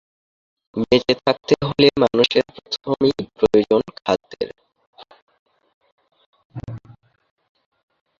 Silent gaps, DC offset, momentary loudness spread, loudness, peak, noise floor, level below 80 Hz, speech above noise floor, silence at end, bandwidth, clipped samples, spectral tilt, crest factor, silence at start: 4.87-4.93 s, 5.22-5.27 s, 5.39-5.46 s, 5.74-5.81 s, 5.92-5.98 s, 6.26-6.33 s, 6.45-6.50 s; under 0.1%; 19 LU; -19 LUFS; 0 dBFS; -37 dBFS; -52 dBFS; 19 dB; 1.4 s; 7.4 kHz; under 0.1%; -6 dB/octave; 22 dB; 0.75 s